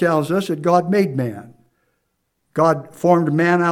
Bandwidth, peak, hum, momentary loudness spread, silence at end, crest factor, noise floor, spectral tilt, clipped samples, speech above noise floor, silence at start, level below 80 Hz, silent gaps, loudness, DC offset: 15.5 kHz; 0 dBFS; none; 10 LU; 0 s; 18 dB; -71 dBFS; -7 dB/octave; under 0.1%; 54 dB; 0 s; -70 dBFS; none; -18 LUFS; under 0.1%